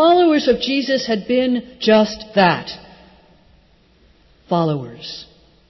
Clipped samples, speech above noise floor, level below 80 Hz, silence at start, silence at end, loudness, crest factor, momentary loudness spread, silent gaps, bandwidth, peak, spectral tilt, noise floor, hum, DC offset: under 0.1%; 35 dB; -52 dBFS; 0 s; 0.45 s; -17 LUFS; 16 dB; 17 LU; none; 6.2 kHz; -4 dBFS; -6 dB/octave; -53 dBFS; none; under 0.1%